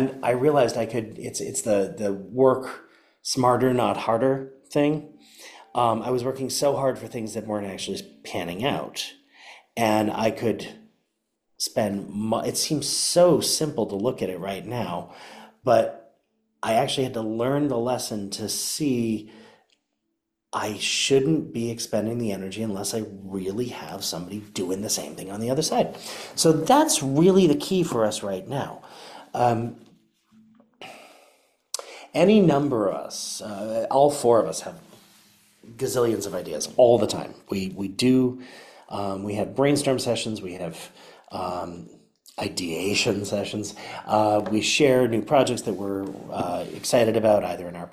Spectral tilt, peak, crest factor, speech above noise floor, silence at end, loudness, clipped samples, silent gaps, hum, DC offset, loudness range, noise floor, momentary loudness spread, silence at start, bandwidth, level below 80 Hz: -4.5 dB/octave; -6 dBFS; 20 dB; 55 dB; 0.05 s; -24 LUFS; under 0.1%; none; none; under 0.1%; 7 LU; -78 dBFS; 15 LU; 0 s; 16 kHz; -60 dBFS